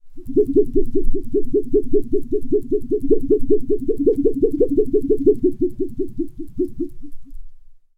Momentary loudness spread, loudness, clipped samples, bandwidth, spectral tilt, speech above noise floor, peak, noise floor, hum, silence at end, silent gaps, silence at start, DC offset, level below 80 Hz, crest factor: 9 LU; -20 LUFS; under 0.1%; 0.9 kHz; -11.5 dB/octave; 21 dB; -2 dBFS; -37 dBFS; none; 0.25 s; none; 0.05 s; under 0.1%; -28 dBFS; 14 dB